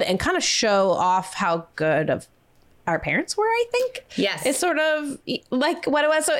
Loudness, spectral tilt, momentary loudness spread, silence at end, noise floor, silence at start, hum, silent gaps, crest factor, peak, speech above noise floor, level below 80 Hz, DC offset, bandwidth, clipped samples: -22 LUFS; -3 dB/octave; 7 LU; 0 s; -56 dBFS; 0 s; none; none; 12 dB; -12 dBFS; 34 dB; -52 dBFS; under 0.1%; 16.5 kHz; under 0.1%